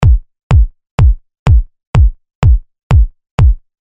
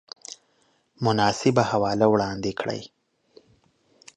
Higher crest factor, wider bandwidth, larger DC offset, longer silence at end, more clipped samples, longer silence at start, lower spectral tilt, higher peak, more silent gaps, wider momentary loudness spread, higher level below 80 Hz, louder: second, 10 dB vs 20 dB; second, 8 kHz vs 10.5 kHz; neither; second, 0.3 s vs 1.3 s; neither; second, 0 s vs 0.3 s; first, -8 dB/octave vs -5.5 dB/octave; first, 0 dBFS vs -4 dBFS; first, 0.43-0.50 s, 0.91-0.98 s, 1.39-1.46 s, 1.87-1.93 s, 2.35-2.42 s, 2.83-2.90 s, 3.31-3.38 s vs none; second, 5 LU vs 19 LU; first, -12 dBFS vs -58 dBFS; first, -13 LUFS vs -23 LUFS